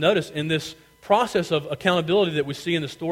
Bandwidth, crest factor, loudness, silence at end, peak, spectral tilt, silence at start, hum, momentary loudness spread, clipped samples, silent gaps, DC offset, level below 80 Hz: 16.5 kHz; 18 dB; -23 LUFS; 0 s; -4 dBFS; -5.5 dB/octave; 0 s; none; 6 LU; under 0.1%; none; under 0.1%; -58 dBFS